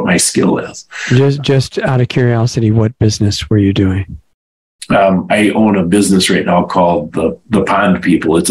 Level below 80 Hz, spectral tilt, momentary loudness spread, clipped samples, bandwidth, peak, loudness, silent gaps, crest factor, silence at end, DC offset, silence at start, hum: -42 dBFS; -5.5 dB/octave; 5 LU; under 0.1%; 15.5 kHz; 0 dBFS; -12 LUFS; 4.34-4.79 s; 12 dB; 0 s; 0.2%; 0 s; none